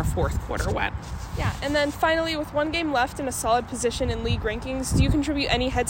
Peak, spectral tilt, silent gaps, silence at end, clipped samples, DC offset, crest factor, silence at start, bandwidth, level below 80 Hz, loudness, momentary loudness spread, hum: -6 dBFS; -5 dB/octave; none; 0 s; under 0.1%; under 0.1%; 18 dB; 0 s; 16.5 kHz; -34 dBFS; -25 LUFS; 6 LU; none